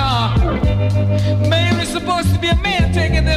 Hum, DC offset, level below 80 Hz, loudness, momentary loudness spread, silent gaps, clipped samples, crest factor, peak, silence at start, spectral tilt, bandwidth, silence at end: none; under 0.1%; -22 dBFS; -16 LUFS; 2 LU; none; under 0.1%; 10 dB; -4 dBFS; 0 s; -6 dB/octave; 13.5 kHz; 0 s